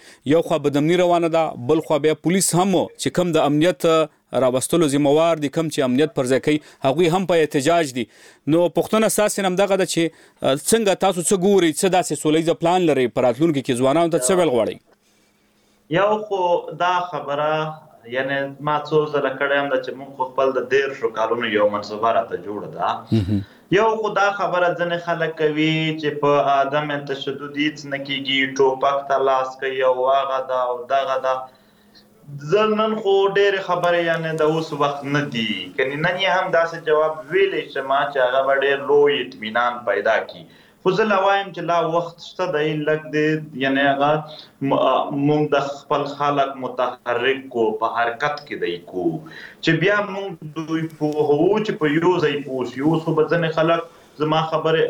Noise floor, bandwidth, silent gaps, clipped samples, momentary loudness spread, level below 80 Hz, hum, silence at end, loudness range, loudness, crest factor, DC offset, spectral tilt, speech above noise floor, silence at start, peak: -60 dBFS; 18.5 kHz; none; under 0.1%; 8 LU; -58 dBFS; none; 0 s; 4 LU; -20 LUFS; 16 dB; under 0.1%; -4.5 dB/octave; 40 dB; 0.05 s; -4 dBFS